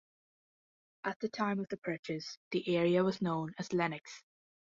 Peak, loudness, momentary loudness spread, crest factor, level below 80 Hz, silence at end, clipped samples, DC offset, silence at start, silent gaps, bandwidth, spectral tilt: -18 dBFS; -35 LUFS; 12 LU; 18 dB; -76 dBFS; 0.5 s; under 0.1%; under 0.1%; 1.05 s; 1.16-1.20 s, 1.78-1.82 s, 1.99-2.03 s, 2.37-2.51 s; 7.6 kHz; -6 dB/octave